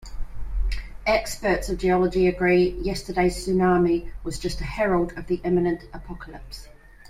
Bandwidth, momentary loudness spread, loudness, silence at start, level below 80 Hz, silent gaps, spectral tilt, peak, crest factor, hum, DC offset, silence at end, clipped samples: 15 kHz; 19 LU; -24 LUFS; 0 s; -34 dBFS; none; -6 dB/octave; -8 dBFS; 16 dB; none; under 0.1%; 0.05 s; under 0.1%